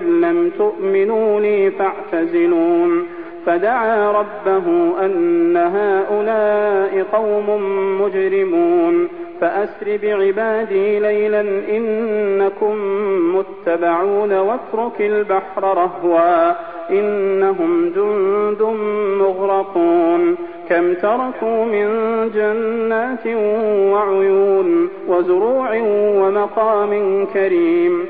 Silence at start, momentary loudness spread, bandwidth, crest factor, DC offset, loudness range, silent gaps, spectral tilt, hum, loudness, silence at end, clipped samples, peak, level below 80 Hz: 0 s; 5 LU; 4.3 kHz; 12 dB; 0.6%; 2 LU; none; -10.5 dB/octave; none; -17 LUFS; 0 s; under 0.1%; -4 dBFS; -60 dBFS